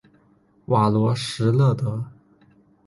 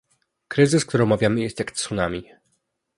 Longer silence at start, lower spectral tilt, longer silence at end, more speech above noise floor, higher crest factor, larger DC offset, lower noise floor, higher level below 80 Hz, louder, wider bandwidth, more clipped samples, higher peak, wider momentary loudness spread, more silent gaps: first, 0.7 s vs 0.5 s; first, -7 dB/octave vs -5.5 dB/octave; about the same, 0.8 s vs 0.75 s; second, 39 dB vs 51 dB; about the same, 16 dB vs 20 dB; neither; second, -59 dBFS vs -72 dBFS; second, -56 dBFS vs -50 dBFS; about the same, -21 LUFS vs -22 LUFS; about the same, 11.5 kHz vs 11.5 kHz; neither; second, -6 dBFS vs -2 dBFS; about the same, 11 LU vs 9 LU; neither